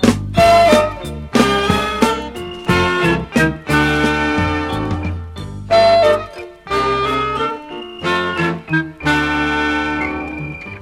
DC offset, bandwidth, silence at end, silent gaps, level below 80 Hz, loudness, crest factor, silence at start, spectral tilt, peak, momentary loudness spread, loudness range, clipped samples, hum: under 0.1%; 16 kHz; 0 s; none; -34 dBFS; -16 LUFS; 16 dB; 0 s; -5 dB/octave; 0 dBFS; 15 LU; 4 LU; under 0.1%; none